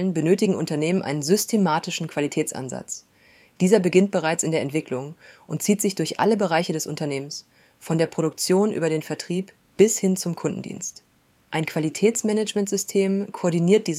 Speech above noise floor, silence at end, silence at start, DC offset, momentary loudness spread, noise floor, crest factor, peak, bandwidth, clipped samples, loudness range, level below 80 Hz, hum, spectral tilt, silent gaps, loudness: 33 dB; 0 s; 0 s; under 0.1%; 12 LU; -56 dBFS; 20 dB; -4 dBFS; 16 kHz; under 0.1%; 2 LU; -68 dBFS; none; -5 dB/octave; none; -23 LUFS